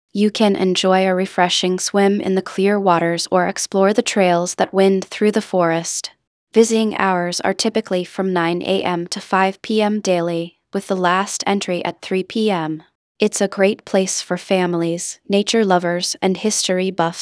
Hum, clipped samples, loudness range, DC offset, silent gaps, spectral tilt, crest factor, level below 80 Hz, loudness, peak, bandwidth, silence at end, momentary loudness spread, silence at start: none; under 0.1%; 3 LU; under 0.1%; 6.27-6.47 s, 12.95-13.15 s; -4 dB/octave; 18 dB; -68 dBFS; -18 LUFS; 0 dBFS; 11 kHz; 0 s; 7 LU; 0.15 s